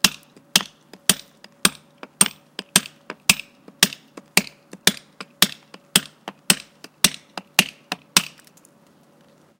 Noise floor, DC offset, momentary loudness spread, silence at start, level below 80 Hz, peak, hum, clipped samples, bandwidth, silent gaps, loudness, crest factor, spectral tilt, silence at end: -55 dBFS; under 0.1%; 17 LU; 0.05 s; -56 dBFS; 0 dBFS; none; under 0.1%; 17 kHz; none; -20 LUFS; 24 dB; -0.5 dB/octave; 1.35 s